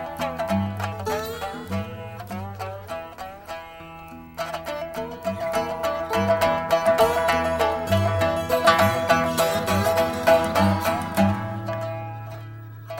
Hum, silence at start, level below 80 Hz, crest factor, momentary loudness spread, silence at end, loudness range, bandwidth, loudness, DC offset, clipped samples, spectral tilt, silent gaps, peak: none; 0 s; -52 dBFS; 20 dB; 17 LU; 0 s; 13 LU; 17 kHz; -23 LUFS; under 0.1%; under 0.1%; -5 dB/octave; none; -4 dBFS